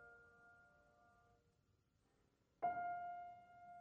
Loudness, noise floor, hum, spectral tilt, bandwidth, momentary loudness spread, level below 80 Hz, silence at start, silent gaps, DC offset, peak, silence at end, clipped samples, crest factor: -48 LUFS; -81 dBFS; none; -6.5 dB/octave; 5.4 kHz; 23 LU; -84 dBFS; 0 s; none; under 0.1%; -32 dBFS; 0 s; under 0.1%; 22 dB